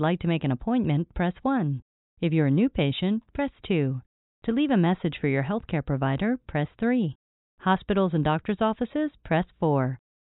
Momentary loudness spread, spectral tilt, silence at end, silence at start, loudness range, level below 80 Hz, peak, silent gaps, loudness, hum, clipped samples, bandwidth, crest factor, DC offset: 8 LU; -6.5 dB/octave; 0.4 s; 0 s; 1 LU; -50 dBFS; -10 dBFS; 1.82-2.17 s, 4.06-4.42 s, 7.15-7.58 s; -26 LUFS; none; under 0.1%; 4.1 kHz; 16 dB; under 0.1%